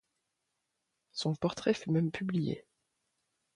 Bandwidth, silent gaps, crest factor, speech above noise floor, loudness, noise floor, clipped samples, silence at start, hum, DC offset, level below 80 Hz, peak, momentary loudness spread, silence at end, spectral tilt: 10.5 kHz; none; 20 dB; 52 dB; -34 LUFS; -84 dBFS; under 0.1%; 1.15 s; none; under 0.1%; -68 dBFS; -16 dBFS; 9 LU; 0.95 s; -6.5 dB/octave